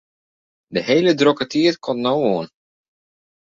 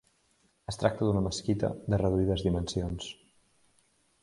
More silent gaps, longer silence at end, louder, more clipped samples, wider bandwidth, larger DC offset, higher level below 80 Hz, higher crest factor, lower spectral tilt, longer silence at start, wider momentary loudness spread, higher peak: neither; about the same, 1.05 s vs 1.1 s; first, -18 LUFS vs -30 LUFS; neither; second, 7.6 kHz vs 11.5 kHz; neither; second, -62 dBFS vs -46 dBFS; about the same, 18 dB vs 22 dB; about the same, -5.5 dB/octave vs -6.5 dB/octave; about the same, 0.7 s vs 0.7 s; second, 10 LU vs 14 LU; first, -2 dBFS vs -10 dBFS